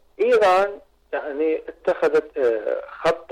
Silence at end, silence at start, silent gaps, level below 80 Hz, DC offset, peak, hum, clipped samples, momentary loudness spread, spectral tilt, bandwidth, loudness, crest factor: 0.05 s; 0.2 s; none; -58 dBFS; under 0.1%; -12 dBFS; none; under 0.1%; 12 LU; -4.5 dB/octave; 11 kHz; -21 LUFS; 10 dB